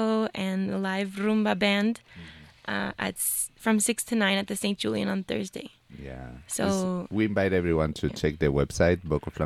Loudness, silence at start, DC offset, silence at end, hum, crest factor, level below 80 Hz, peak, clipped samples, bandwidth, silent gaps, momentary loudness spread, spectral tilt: -27 LUFS; 0 s; under 0.1%; 0 s; none; 18 dB; -46 dBFS; -10 dBFS; under 0.1%; 15.5 kHz; none; 17 LU; -4.5 dB/octave